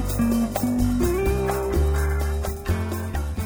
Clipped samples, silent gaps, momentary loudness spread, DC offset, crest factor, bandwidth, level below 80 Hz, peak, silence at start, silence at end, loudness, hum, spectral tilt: under 0.1%; none; 6 LU; under 0.1%; 14 dB; over 20 kHz; -26 dBFS; -10 dBFS; 0 s; 0 s; -24 LUFS; none; -6.5 dB/octave